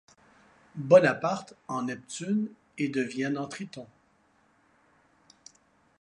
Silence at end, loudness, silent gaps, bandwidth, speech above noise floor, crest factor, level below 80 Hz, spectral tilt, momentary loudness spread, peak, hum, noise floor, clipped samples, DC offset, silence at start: 2.15 s; -28 LUFS; none; 11 kHz; 39 dB; 24 dB; -74 dBFS; -6 dB/octave; 20 LU; -6 dBFS; none; -66 dBFS; under 0.1%; under 0.1%; 0.75 s